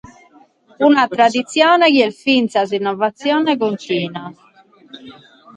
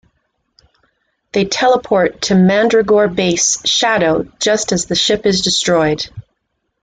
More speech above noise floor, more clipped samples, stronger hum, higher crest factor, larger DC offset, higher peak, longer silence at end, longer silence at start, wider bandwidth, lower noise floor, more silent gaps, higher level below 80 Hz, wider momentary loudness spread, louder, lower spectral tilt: second, 34 dB vs 56 dB; neither; neither; about the same, 16 dB vs 14 dB; neither; about the same, 0 dBFS vs -2 dBFS; second, 0.45 s vs 0.65 s; second, 0.8 s vs 1.35 s; about the same, 9.6 kHz vs 9.4 kHz; second, -49 dBFS vs -70 dBFS; neither; second, -64 dBFS vs -46 dBFS; first, 10 LU vs 5 LU; about the same, -15 LUFS vs -13 LUFS; about the same, -4.5 dB/octave vs -3.5 dB/octave